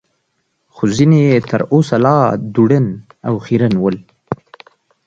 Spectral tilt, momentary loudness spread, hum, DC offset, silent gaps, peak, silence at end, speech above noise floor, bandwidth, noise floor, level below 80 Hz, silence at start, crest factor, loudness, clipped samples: -8 dB/octave; 15 LU; none; under 0.1%; none; 0 dBFS; 0.7 s; 54 dB; 8 kHz; -66 dBFS; -50 dBFS; 0.75 s; 14 dB; -14 LUFS; under 0.1%